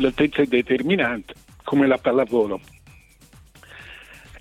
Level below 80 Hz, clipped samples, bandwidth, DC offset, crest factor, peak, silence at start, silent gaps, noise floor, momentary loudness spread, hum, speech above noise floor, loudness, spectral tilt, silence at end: -52 dBFS; under 0.1%; 13 kHz; under 0.1%; 18 dB; -4 dBFS; 0 s; none; -50 dBFS; 22 LU; none; 30 dB; -21 LUFS; -6.5 dB/octave; 0 s